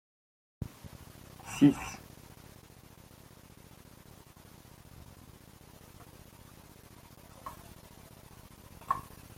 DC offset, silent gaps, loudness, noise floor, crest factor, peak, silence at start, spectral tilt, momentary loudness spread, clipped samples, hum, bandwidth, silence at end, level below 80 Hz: under 0.1%; none; -33 LUFS; -55 dBFS; 28 dB; -12 dBFS; 0.6 s; -6 dB/octave; 18 LU; under 0.1%; none; 16.5 kHz; 0.3 s; -60 dBFS